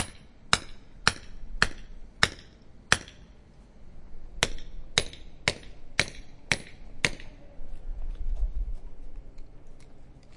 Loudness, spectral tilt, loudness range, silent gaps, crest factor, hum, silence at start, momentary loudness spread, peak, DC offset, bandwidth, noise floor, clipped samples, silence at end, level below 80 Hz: -29 LUFS; -2 dB/octave; 7 LU; none; 30 dB; none; 0 s; 23 LU; -2 dBFS; under 0.1%; 11.5 kHz; -51 dBFS; under 0.1%; 0 s; -38 dBFS